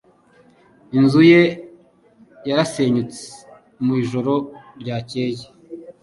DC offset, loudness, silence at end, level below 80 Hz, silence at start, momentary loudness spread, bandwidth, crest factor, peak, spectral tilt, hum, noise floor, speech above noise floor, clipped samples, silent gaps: under 0.1%; -18 LUFS; 0.1 s; -60 dBFS; 0.9 s; 24 LU; 11.5 kHz; 18 dB; -2 dBFS; -6.5 dB/octave; none; -53 dBFS; 36 dB; under 0.1%; none